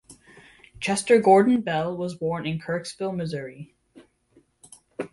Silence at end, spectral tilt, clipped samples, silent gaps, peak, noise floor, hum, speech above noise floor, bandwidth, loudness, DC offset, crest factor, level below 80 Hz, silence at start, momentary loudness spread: 0.05 s; -5.5 dB/octave; under 0.1%; none; -4 dBFS; -62 dBFS; none; 39 dB; 11.5 kHz; -23 LUFS; under 0.1%; 20 dB; -60 dBFS; 0.1 s; 20 LU